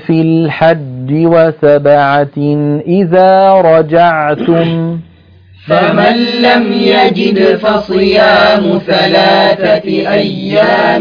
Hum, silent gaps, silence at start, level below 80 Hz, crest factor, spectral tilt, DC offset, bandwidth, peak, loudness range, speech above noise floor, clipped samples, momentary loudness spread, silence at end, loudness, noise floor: none; none; 0 s; -46 dBFS; 8 dB; -8 dB/octave; under 0.1%; 5.4 kHz; 0 dBFS; 2 LU; 31 dB; 0.5%; 7 LU; 0 s; -9 LUFS; -39 dBFS